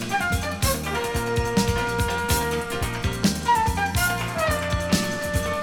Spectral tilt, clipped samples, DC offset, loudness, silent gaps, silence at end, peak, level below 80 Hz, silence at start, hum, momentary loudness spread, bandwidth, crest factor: -4 dB/octave; under 0.1%; under 0.1%; -24 LUFS; none; 0 s; -6 dBFS; -34 dBFS; 0 s; none; 4 LU; over 20 kHz; 18 dB